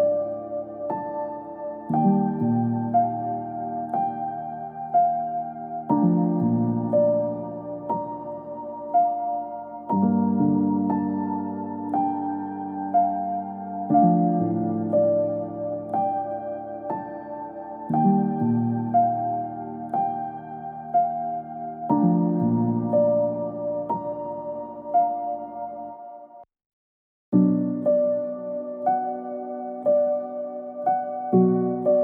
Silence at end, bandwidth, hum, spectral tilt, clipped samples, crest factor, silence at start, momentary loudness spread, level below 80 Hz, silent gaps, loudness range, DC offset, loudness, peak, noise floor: 0 s; 2.5 kHz; none; -13.5 dB/octave; under 0.1%; 16 dB; 0 s; 13 LU; -66 dBFS; 26.66-27.32 s; 3 LU; under 0.1%; -25 LUFS; -8 dBFS; -45 dBFS